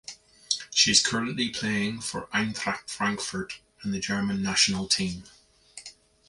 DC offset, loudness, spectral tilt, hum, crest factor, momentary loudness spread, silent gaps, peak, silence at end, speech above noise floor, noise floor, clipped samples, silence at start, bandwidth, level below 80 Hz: under 0.1%; -26 LUFS; -2 dB/octave; none; 24 dB; 20 LU; none; -4 dBFS; 0.35 s; 23 dB; -50 dBFS; under 0.1%; 0.1 s; 11.5 kHz; -58 dBFS